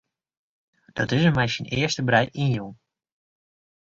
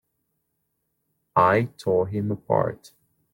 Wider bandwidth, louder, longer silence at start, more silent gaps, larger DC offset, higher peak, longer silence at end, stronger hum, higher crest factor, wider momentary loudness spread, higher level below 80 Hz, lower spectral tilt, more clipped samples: second, 7.8 kHz vs 17 kHz; about the same, -23 LUFS vs -23 LUFS; second, 0.95 s vs 1.35 s; neither; neither; about the same, -4 dBFS vs -6 dBFS; first, 1.1 s vs 0.6 s; neither; about the same, 22 dB vs 20 dB; about the same, 10 LU vs 10 LU; first, -54 dBFS vs -62 dBFS; second, -5.5 dB/octave vs -8 dB/octave; neither